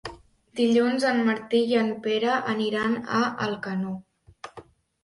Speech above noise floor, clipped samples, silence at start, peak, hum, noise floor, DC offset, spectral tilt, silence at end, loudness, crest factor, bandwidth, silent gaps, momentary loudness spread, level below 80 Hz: 25 dB; under 0.1%; 0.05 s; -10 dBFS; none; -49 dBFS; under 0.1%; -5.5 dB/octave; 0.45 s; -25 LUFS; 16 dB; 11.5 kHz; none; 19 LU; -62 dBFS